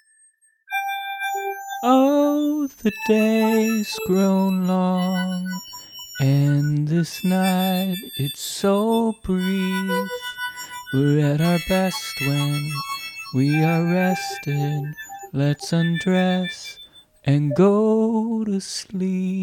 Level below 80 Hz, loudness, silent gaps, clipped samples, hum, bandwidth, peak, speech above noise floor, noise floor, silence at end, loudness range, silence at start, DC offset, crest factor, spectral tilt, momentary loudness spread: -54 dBFS; -21 LUFS; none; under 0.1%; none; 18 kHz; -6 dBFS; 38 dB; -59 dBFS; 0 s; 3 LU; 0.7 s; under 0.1%; 16 dB; -6 dB/octave; 11 LU